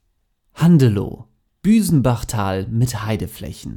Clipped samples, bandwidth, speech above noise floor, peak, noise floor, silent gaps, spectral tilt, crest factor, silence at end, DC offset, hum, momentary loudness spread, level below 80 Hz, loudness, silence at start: under 0.1%; 18 kHz; 49 dB; -2 dBFS; -66 dBFS; none; -7 dB/octave; 16 dB; 0 s; under 0.1%; none; 16 LU; -40 dBFS; -18 LUFS; 0.55 s